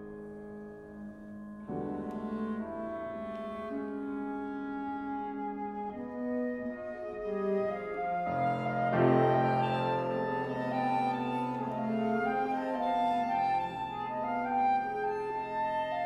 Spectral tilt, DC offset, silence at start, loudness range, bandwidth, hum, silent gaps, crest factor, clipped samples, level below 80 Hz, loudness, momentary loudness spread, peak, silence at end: -8 dB/octave; under 0.1%; 0 s; 8 LU; 11.5 kHz; none; none; 20 dB; under 0.1%; -64 dBFS; -33 LUFS; 11 LU; -12 dBFS; 0 s